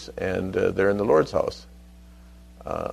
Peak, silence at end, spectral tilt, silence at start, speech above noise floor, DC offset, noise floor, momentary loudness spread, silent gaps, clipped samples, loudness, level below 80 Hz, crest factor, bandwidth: -8 dBFS; 0 s; -6.5 dB/octave; 0 s; 24 dB; under 0.1%; -47 dBFS; 15 LU; none; under 0.1%; -24 LUFS; -46 dBFS; 18 dB; 13.5 kHz